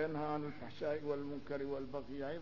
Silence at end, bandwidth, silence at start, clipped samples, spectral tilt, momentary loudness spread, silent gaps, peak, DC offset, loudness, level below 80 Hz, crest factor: 0 s; 6 kHz; 0 s; under 0.1%; -5.5 dB/octave; 5 LU; none; -26 dBFS; 0.3%; -42 LUFS; -66 dBFS; 16 dB